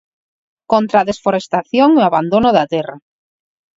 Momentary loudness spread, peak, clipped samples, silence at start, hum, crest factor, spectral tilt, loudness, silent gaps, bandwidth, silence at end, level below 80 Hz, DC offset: 8 LU; 0 dBFS; under 0.1%; 0.7 s; none; 16 dB; -6.5 dB/octave; -14 LUFS; none; 7.8 kHz; 0.8 s; -50 dBFS; under 0.1%